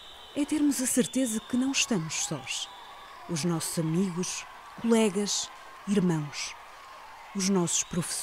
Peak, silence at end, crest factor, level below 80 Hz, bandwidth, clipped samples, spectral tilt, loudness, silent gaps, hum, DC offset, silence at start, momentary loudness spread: -10 dBFS; 0 s; 18 dB; -62 dBFS; 16 kHz; under 0.1%; -4 dB/octave; -29 LUFS; none; none; under 0.1%; 0 s; 19 LU